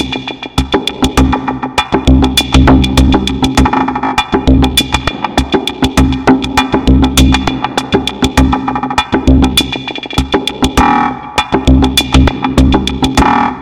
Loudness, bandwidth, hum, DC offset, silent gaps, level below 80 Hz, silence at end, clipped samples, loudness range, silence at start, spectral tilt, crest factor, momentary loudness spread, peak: -11 LUFS; 17 kHz; none; under 0.1%; none; -16 dBFS; 0 s; 0.4%; 2 LU; 0 s; -5 dB/octave; 10 dB; 6 LU; 0 dBFS